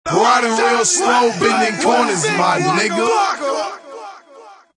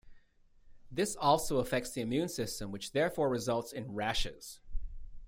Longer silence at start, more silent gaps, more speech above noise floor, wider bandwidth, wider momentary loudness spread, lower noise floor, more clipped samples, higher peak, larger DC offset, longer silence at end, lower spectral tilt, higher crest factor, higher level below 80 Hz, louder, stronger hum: about the same, 0.05 s vs 0.05 s; neither; about the same, 27 dB vs 29 dB; second, 10.5 kHz vs 16 kHz; second, 13 LU vs 18 LU; second, -42 dBFS vs -62 dBFS; neither; first, 0 dBFS vs -14 dBFS; neither; first, 0.2 s vs 0 s; second, -3 dB/octave vs -4.5 dB/octave; about the same, 16 dB vs 20 dB; second, -60 dBFS vs -48 dBFS; first, -15 LUFS vs -34 LUFS; neither